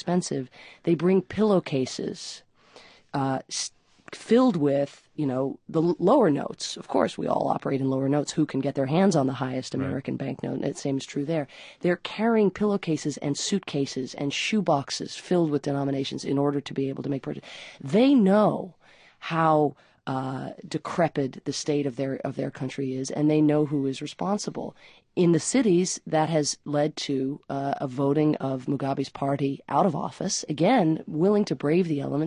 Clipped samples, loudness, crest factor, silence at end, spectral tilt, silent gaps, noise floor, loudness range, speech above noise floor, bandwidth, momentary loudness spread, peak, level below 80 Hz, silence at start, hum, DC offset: under 0.1%; -26 LUFS; 18 dB; 0 s; -5.5 dB/octave; none; -53 dBFS; 3 LU; 28 dB; 10.5 kHz; 11 LU; -8 dBFS; -64 dBFS; 0.05 s; none; under 0.1%